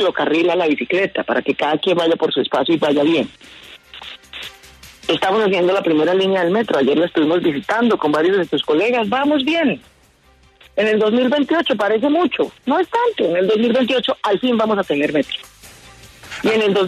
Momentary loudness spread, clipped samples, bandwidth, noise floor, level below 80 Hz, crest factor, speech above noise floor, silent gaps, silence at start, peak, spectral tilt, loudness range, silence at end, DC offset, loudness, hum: 11 LU; under 0.1%; 13.5 kHz; -52 dBFS; -56 dBFS; 12 dB; 36 dB; none; 0 s; -4 dBFS; -5.5 dB/octave; 3 LU; 0 s; under 0.1%; -17 LUFS; none